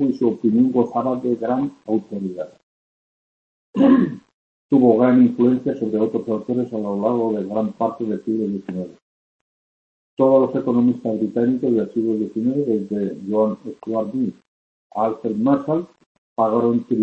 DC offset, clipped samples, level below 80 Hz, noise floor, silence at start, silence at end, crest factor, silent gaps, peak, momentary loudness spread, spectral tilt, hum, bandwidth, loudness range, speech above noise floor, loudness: under 0.1%; under 0.1%; -62 dBFS; under -90 dBFS; 0 s; 0 s; 18 dB; 2.63-3.73 s, 4.34-4.69 s, 9.02-10.17 s, 14.48-14.90 s, 16.06-16.36 s; -2 dBFS; 12 LU; -10 dB/octave; none; 5.6 kHz; 6 LU; over 71 dB; -20 LUFS